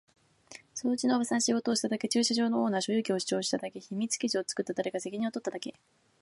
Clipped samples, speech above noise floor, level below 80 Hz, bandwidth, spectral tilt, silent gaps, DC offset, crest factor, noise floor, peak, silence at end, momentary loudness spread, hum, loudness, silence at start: under 0.1%; 23 dB; -78 dBFS; 11.5 kHz; -3.5 dB/octave; none; under 0.1%; 16 dB; -54 dBFS; -16 dBFS; 0.5 s; 11 LU; none; -30 LUFS; 0.5 s